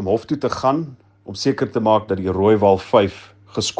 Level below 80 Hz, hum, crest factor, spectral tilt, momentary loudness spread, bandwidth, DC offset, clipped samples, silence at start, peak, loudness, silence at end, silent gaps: -56 dBFS; none; 18 dB; -5.5 dB/octave; 10 LU; 9.8 kHz; under 0.1%; under 0.1%; 0 s; 0 dBFS; -18 LUFS; 0.05 s; none